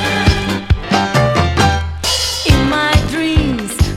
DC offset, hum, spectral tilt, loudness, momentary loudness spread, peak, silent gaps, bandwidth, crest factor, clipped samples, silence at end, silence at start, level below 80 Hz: under 0.1%; none; -4.5 dB/octave; -14 LUFS; 5 LU; 0 dBFS; none; 16 kHz; 14 dB; under 0.1%; 0 s; 0 s; -22 dBFS